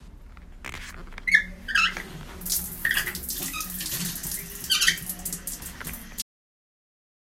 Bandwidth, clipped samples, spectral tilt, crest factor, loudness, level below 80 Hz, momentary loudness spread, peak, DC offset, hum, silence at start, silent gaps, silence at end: 16.5 kHz; under 0.1%; -0.5 dB/octave; 26 dB; -26 LUFS; -44 dBFS; 17 LU; -4 dBFS; under 0.1%; none; 0 s; none; 1 s